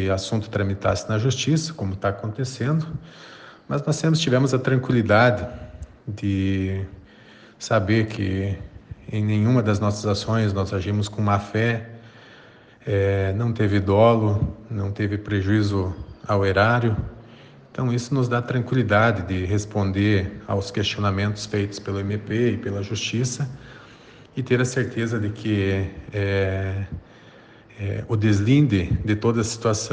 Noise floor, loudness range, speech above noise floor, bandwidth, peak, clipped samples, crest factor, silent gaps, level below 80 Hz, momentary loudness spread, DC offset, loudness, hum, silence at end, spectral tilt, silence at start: -49 dBFS; 4 LU; 27 dB; 9.4 kHz; -4 dBFS; under 0.1%; 18 dB; none; -46 dBFS; 13 LU; under 0.1%; -23 LUFS; none; 0 s; -6 dB/octave; 0 s